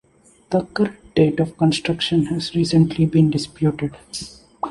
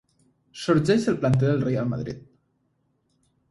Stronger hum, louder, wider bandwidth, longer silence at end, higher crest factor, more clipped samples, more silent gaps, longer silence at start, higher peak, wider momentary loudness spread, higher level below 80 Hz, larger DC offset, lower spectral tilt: neither; first, -19 LUFS vs -23 LUFS; about the same, 11.5 kHz vs 11.5 kHz; second, 0 s vs 1.3 s; about the same, 16 dB vs 18 dB; neither; neither; about the same, 0.5 s vs 0.55 s; first, -2 dBFS vs -8 dBFS; about the same, 14 LU vs 13 LU; first, -48 dBFS vs -54 dBFS; neither; about the same, -6.5 dB/octave vs -7.5 dB/octave